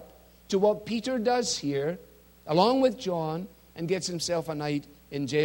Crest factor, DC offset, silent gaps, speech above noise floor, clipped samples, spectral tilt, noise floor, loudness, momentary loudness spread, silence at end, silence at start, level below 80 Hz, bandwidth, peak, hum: 20 dB; under 0.1%; none; 25 dB; under 0.1%; -4.5 dB/octave; -52 dBFS; -28 LUFS; 14 LU; 0 s; 0 s; -60 dBFS; 16.5 kHz; -8 dBFS; none